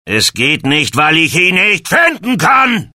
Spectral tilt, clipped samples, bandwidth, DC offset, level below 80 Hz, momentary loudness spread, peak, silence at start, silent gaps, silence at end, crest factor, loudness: -3 dB/octave; under 0.1%; 16.5 kHz; under 0.1%; -48 dBFS; 4 LU; 0 dBFS; 0.05 s; none; 0.1 s; 12 dB; -10 LUFS